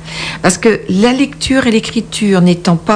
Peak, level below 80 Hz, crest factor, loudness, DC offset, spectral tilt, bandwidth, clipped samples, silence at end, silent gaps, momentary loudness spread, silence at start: 0 dBFS; -38 dBFS; 12 dB; -12 LUFS; under 0.1%; -5 dB/octave; 10 kHz; 0.1%; 0 s; none; 5 LU; 0 s